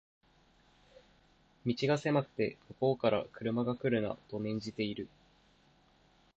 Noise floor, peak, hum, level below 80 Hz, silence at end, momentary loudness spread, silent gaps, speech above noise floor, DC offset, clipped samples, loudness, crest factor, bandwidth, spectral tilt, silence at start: -67 dBFS; -16 dBFS; none; -68 dBFS; 1.3 s; 8 LU; none; 33 dB; under 0.1%; under 0.1%; -34 LUFS; 20 dB; 8.2 kHz; -7 dB/octave; 1.65 s